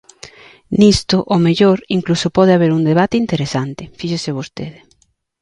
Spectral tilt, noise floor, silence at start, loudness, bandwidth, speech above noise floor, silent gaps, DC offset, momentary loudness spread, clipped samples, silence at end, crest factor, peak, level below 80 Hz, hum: -6 dB/octave; -58 dBFS; 0.7 s; -15 LUFS; 11 kHz; 44 dB; none; under 0.1%; 14 LU; under 0.1%; 0.7 s; 16 dB; 0 dBFS; -42 dBFS; none